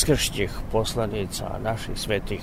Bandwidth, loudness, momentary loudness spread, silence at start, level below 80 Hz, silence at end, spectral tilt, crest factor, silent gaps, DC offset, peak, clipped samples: 16 kHz; -27 LUFS; 7 LU; 0 s; -34 dBFS; 0 s; -4 dB/octave; 18 dB; none; 0.3%; -6 dBFS; under 0.1%